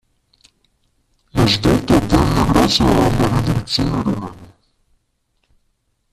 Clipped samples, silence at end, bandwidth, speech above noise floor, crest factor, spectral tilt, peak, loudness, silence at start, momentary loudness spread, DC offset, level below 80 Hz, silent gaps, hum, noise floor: under 0.1%; 1.65 s; 14.5 kHz; 51 dB; 16 dB; -5.5 dB/octave; -2 dBFS; -16 LUFS; 1.35 s; 9 LU; under 0.1%; -30 dBFS; none; none; -66 dBFS